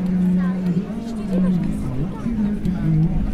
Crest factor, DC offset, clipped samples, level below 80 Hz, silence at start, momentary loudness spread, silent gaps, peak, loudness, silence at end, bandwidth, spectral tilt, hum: 10 dB; under 0.1%; under 0.1%; -30 dBFS; 0 s; 6 LU; none; -10 dBFS; -21 LUFS; 0 s; 10 kHz; -9.5 dB/octave; none